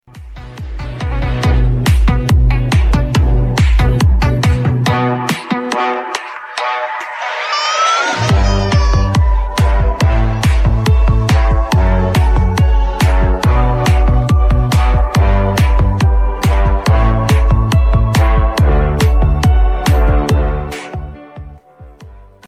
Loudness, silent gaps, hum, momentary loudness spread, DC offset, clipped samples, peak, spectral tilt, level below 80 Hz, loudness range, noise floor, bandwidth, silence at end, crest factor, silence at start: -13 LUFS; none; none; 8 LU; under 0.1%; under 0.1%; 0 dBFS; -6 dB/octave; -14 dBFS; 3 LU; -37 dBFS; 14 kHz; 0.25 s; 12 dB; 0.15 s